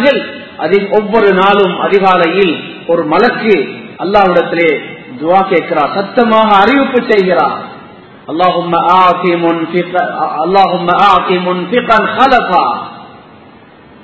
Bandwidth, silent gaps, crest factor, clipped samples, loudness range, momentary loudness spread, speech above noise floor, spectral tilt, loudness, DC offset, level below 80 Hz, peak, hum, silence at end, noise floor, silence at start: 8 kHz; none; 10 dB; 0.5%; 1 LU; 10 LU; 28 dB; -7 dB/octave; -10 LUFS; 0.4%; -46 dBFS; 0 dBFS; none; 0.85 s; -38 dBFS; 0 s